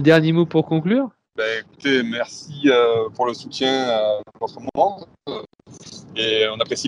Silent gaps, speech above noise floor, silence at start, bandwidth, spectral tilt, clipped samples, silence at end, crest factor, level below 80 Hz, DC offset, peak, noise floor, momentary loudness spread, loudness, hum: none; 21 dB; 0 s; 11 kHz; -5.5 dB/octave; under 0.1%; 0 s; 20 dB; -64 dBFS; under 0.1%; 0 dBFS; -41 dBFS; 16 LU; -20 LUFS; none